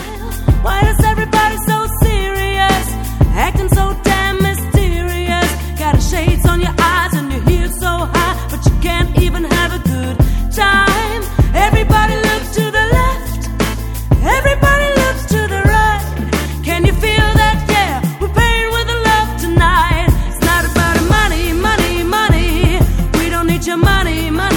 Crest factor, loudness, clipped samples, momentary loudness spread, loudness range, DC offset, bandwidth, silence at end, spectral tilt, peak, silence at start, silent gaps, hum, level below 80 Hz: 12 dB; -14 LUFS; under 0.1%; 6 LU; 2 LU; under 0.1%; 17.5 kHz; 0 s; -5 dB/octave; 0 dBFS; 0 s; none; none; -18 dBFS